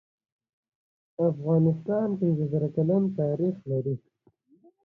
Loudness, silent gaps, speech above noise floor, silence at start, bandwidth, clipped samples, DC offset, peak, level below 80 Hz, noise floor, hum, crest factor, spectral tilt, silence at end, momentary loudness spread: -27 LUFS; none; 38 dB; 1.2 s; 2.5 kHz; under 0.1%; under 0.1%; -12 dBFS; -64 dBFS; -64 dBFS; none; 14 dB; -12.5 dB/octave; 0.9 s; 7 LU